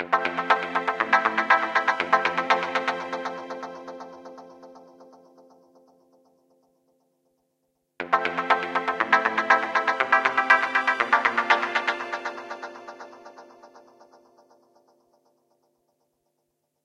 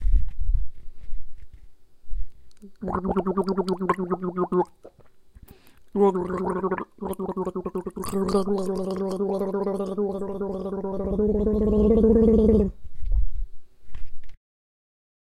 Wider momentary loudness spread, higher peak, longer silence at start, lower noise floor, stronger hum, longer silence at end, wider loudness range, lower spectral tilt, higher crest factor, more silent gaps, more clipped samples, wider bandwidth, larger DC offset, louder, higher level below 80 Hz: about the same, 19 LU vs 21 LU; first, -2 dBFS vs -6 dBFS; about the same, 0 s vs 0 s; first, -76 dBFS vs -49 dBFS; neither; first, 3.05 s vs 1 s; first, 18 LU vs 7 LU; second, -3 dB/octave vs -8.5 dB/octave; first, 24 dB vs 16 dB; neither; neither; second, 11.5 kHz vs 13.5 kHz; neither; about the same, -23 LUFS vs -25 LUFS; second, -78 dBFS vs -32 dBFS